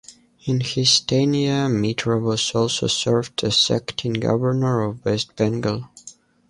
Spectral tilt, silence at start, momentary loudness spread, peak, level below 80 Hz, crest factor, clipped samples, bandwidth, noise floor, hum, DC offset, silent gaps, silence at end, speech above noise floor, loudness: -4.5 dB/octave; 0.1 s; 8 LU; -4 dBFS; -52 dBFS; 18 dB; under 0.1%; 11.5 kHz; -46 dBFS; none; under 0.1%; none; 0.4 s; 26 dB; -20 LUFS